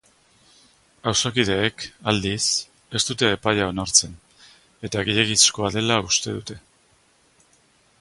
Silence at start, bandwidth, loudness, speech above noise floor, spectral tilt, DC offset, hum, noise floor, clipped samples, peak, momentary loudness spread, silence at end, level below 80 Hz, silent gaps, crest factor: 1.05 s; 11.5 kHz; -20 LUFS; 38 dB; -2.5 dB/octave; under 0.1%; none; -60 dBFS; under 0.1%; -2 dBFS; 13 LU; 1.4 s; -50 dBFS; none; 24 dB